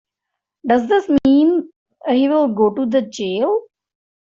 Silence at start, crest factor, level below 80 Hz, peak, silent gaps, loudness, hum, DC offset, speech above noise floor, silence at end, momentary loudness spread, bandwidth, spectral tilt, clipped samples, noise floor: 0.65 s; 14 dB; -54 dBFS; -4 dBFS; 1.76-1.86 s; -17 LUFS; none; under 0.1%; 65 dB; 0.8 s; 9 LU; 7.4 kHz; -6 dB/octave; under 0.1%; -81 dBFS